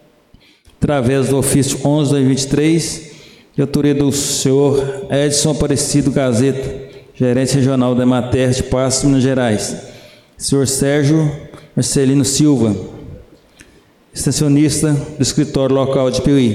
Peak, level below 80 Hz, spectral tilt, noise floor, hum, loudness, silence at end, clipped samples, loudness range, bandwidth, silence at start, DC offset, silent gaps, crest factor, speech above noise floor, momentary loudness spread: -4 dBFS; -38 dBFS; -5.5 dB/octave; -49 dBFS; none; -15 LUFS; 0 s; under 0.1%; 2 LU; 15.5 kHz; 0.8 s; under 0.1%; none; 12 dB; 35 dB; 9 LU